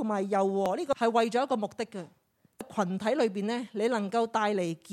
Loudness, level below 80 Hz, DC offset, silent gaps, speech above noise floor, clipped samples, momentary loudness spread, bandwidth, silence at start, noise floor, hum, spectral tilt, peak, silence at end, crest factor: -29 LUFS; -74 dBFS; under 0.1%; none; 20 dB; under 0.1%; 11 LU; 14 kHz; 0 s; -49 dBFS; none; -5.5 dB/octave; -12 dBFS; 0 s; 16 dB